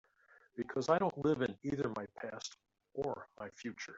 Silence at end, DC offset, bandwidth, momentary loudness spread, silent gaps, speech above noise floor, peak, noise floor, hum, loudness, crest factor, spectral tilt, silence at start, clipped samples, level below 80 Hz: 0 s; under 0.1%; 8 kHz; 15 LU; none; 30 dB; -18 dBFS; -68 dBFS; none; -38 LUFS; 22 dB; -5.5 dB/octave; 0.55 s; under 0.1%; -70 dBFS